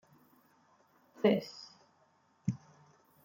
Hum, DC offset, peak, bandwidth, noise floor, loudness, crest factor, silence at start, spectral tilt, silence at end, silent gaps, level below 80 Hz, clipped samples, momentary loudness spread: none; under 0.1%; -14 dBFS; 16.5 kHz; -70 dBFS; -35 LUFS; 24 dB; 1.25 s; -7 dB/octave; 0.7 s; none; -76 dBFS; under 0.1%; 20 LU